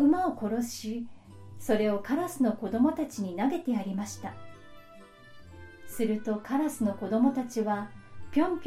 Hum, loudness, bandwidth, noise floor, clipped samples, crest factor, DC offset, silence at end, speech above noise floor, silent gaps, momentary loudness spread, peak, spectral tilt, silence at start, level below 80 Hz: none; -30 LUFS; 16 kHz; -52 dBFS; under 0.1%; 18 dB; under 0.1%; 0 s; 22 dB; none; 17 LU; -12 dBFS; -6 dB/octave; 0 s; -62 dBFS